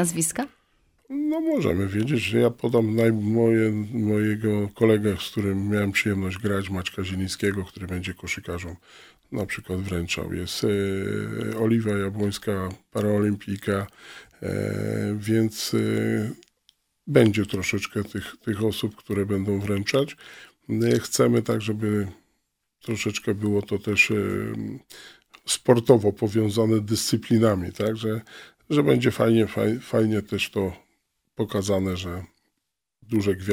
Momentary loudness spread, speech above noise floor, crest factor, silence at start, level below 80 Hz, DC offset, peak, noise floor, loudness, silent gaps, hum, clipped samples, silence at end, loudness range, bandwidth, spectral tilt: 12 LU; 57 dB; 22 dB; 0 s; -54 dBFS; under 0.1%; -2 dBFS; -81 dBFS; -24 LUFS; none; none; under 0.1%; 0 s; 6 LU; 16.5 kHz; -5.5 dB/octave